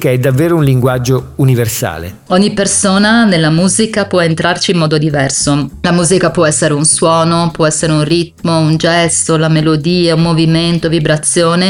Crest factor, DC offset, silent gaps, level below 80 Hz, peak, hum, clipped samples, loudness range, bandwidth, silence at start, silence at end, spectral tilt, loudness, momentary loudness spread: 10 dB; under 0.1%; none; -38 dBFS; 0 dBFS; none; under 0.1%; 1 LU; 17.5 kHz; 0 s; 0 s; -4.5 dB/octave; -11 LUFS; 5 LU